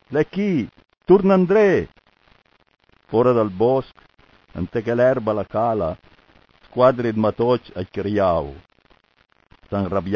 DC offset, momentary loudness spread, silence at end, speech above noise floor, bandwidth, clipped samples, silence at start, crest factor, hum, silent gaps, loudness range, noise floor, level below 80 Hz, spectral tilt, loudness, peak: under 0.1%; 15 LU; 0 s; 42 dB; 6.8 kHz; under 0.1%; 0.1 s; 20 dB; none; none; 4 LU; -61 dBFS; -46 dBFS; -9 dB/octave; -20 LUFS; -2 dBFS